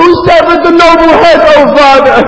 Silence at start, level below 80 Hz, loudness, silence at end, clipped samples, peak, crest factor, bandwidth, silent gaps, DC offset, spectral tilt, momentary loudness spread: 0 s; -30 dBFS; -3 LUFS; 0 s; 20%; 0 dBFS; 4 dB; 8 kHz; none; under 0.1%; -5 dB/octave; 2 LU